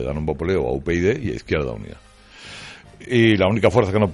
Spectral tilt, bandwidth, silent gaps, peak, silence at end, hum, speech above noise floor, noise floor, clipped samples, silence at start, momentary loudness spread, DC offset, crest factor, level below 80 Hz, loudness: -7 dB/octave; 11.5 kHz; none; -4 dBFS; 0 s; none; 22 dB; -41 dBFS; under 0.1%; 0 s; 21 LU; under 0.1%; 18 dB; -40 dBFS; -20 LUFS